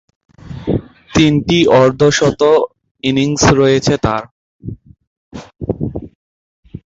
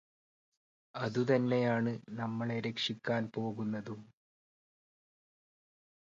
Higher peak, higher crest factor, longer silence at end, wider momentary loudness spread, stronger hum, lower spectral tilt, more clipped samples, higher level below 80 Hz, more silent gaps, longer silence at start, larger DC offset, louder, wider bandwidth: first, 0 dBFS vs -16 dBFS; second, 14 dB vs 20 dB; second, 0.05 s vs 2 s; first, 21 LU vs 11 LU; neither; second, -5 dB/octave vs -6.5 dB/octave; neither; first, -36 dBFS vs -76 dBFS; first, 2.91-2.95 s, 4.31-4.59 s, 5.07-5.31 s, 6.15-6.63 s vs none; second, 0.45 s vs 0.95 s; neither; first, -13 LUFS vs -35 LUFS; about the same, 8 kHz vs 7.6 kHz